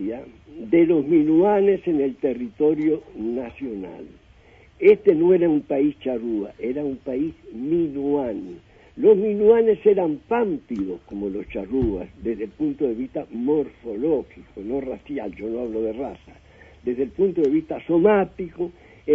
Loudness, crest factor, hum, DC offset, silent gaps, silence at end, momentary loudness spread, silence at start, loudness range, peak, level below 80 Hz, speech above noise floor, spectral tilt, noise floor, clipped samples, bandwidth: -22 LUFS; 18 dB; none; under 0.1%; none; 0 s; 15 LU; 0 s; 6 LU; -4 dBFS; -50 dBFS; 30 dB; -9.5 dB/octave; -51 dBFS; under 0.1%; 3.7 kHz